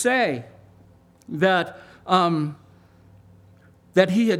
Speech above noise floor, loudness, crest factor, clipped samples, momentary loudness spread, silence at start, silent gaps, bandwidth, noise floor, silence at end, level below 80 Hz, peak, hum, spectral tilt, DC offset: 33 dB; -22 LUFS; 22 dB; under 0.1%; 14 LU; 0 s; none; 14.5 kHz; -53 dBFS; 0 s; -66 dBFS; -2 dBFS; none; -5.5 dB/octave; under 0.1%